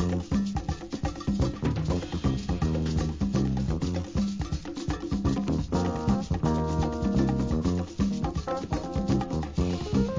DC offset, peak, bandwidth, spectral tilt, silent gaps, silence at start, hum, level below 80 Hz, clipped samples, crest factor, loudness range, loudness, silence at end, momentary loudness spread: 0.2%; -12 dBFS; 7.6 kHz; -7 dB/octave; none; 0 s; none; -36 dBFS; under 0.1%; 16 dB; 2 LU; -29 LUFS; 0 s; 5 LU